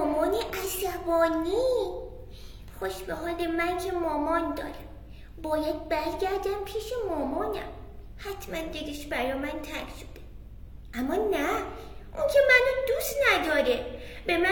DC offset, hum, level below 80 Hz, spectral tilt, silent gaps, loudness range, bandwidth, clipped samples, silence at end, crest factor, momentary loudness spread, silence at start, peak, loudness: under 0.1%; none; -46 dBFS; -4 dB/octave; none; 9 LU; 18 kHz; under 0.1%; 0 s; 20 dB; 22 LU; 0 s; -8 dBFS; -28 LUFS